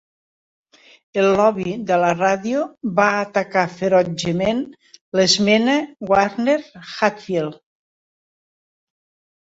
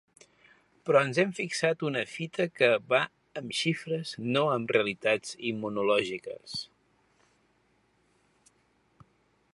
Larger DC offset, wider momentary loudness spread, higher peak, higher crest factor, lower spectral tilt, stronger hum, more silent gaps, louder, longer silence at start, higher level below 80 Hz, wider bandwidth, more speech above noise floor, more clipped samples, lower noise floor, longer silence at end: neither; second, 9 LU vs 13 LU; first, -2 dBFS vs -8 dBFS; about the same, 18 dB vs 22 dB; about the same, -4.5 dB/octave vs -4.5 dB/octave; neither; first, 5.01-5.12 s vs none; first, -19 LUFS vs -29 LUFS; first, 1.15 s vs 0.85 s; first, -58 dBFS vs -74 dBFS; second, 8 kHz vs 11.5 kHz; first, over 72 dB vs 41 dB; neither; first, under -90 dBFS vs -69 dBFS; second, 1.9 s vs 2.9 s